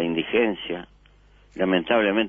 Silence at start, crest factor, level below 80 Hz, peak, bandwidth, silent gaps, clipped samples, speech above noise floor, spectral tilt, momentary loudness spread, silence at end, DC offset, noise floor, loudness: 0 s; 18 dB; -54 dBFS; -6 dBFS; 3.8 kHz; none; under 0.1%; 32 dB; -7.5 dB/octave; 13 LU; 0 s; under 0.1%; -54 dBFS; -24 LUFS